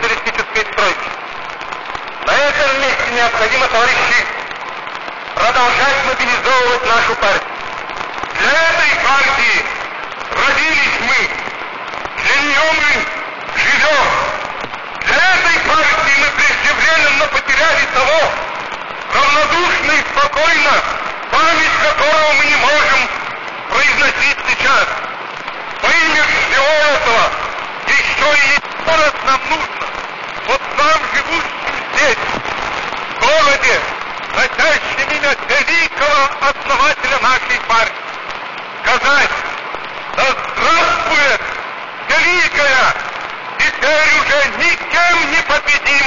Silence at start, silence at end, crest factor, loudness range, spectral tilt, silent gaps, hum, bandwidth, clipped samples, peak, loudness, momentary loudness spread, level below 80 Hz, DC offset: 0 s; 0 s; 12 dB; 3 LU; -1.5 dB/octave; none; none; 7.4 kHz; under 0.1%; -2 dBFS; -12 LUFS; 13 LU; -40 dBFS; 3%